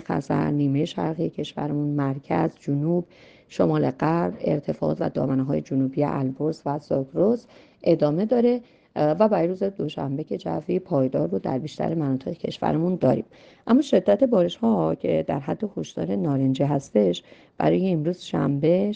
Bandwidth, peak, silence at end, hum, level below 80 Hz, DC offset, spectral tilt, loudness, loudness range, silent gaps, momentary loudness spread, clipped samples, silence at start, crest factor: 8.6 kHz; -6 dBFS; 0 s; none; -58 dBFS; under 0.1%; -8 dB/octave; -24 LUFS; 3 LU; none; 8 LU; under 0.1%; 0 s; 18 dB